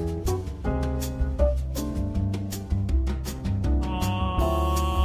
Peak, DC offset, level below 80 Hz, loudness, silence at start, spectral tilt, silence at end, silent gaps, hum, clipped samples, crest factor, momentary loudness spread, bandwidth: -10 dBFS; under 0.1%; -28 dBFS; -27 LUFS; 0 s; -6.5 dB/octave; 0 s; none; none; under 0.1%; 14 dB; 5 LU; 16 kHz